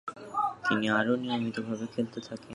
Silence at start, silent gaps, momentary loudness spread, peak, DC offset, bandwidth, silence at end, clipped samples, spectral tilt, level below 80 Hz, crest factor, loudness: 0.05 s; none; 9 LU; -12 dBFS; under 0.1%; 11.5 kHz; 0 s; under 0.1%; -5.5 dB/octave; -70 dBFS; 20 dB; -30 LUFS